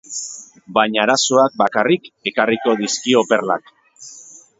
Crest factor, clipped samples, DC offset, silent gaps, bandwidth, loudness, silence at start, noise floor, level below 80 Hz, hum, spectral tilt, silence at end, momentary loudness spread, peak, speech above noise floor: 18 dB; under 0.1%; under 0.1%; none; 8 kHz; -17 LUFS; 0.1 s; -42 dBFS; -64 dBFS; none; -3 dB/octave; 0.2 s; 17 LU; 0 dBFS; 25 dB